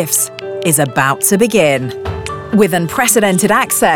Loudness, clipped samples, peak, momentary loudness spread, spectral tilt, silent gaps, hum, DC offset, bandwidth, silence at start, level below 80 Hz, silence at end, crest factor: -13 LUFS; under 0.1%; 0 dBFS; 10 LU; -3.5 dB/octave; none; none; under 0.1%; over 20 kHz; 0 s; -42 dBFS; 0 s; 12 dB